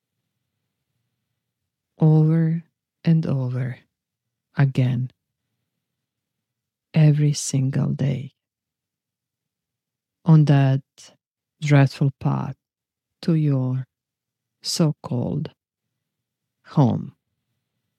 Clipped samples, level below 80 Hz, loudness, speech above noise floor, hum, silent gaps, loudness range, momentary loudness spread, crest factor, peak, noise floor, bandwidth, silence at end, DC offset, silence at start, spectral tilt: under 0.1%; -64 dBFS; -21 LUFS; 68 dB; none; 11.27-11.35 s; 6 LU; 14 LU; 18 dB; -6 dBFS; -87 dBFS; 12 kHz; 0.9 s; under 0.1%; 2 s; -7 dB/octave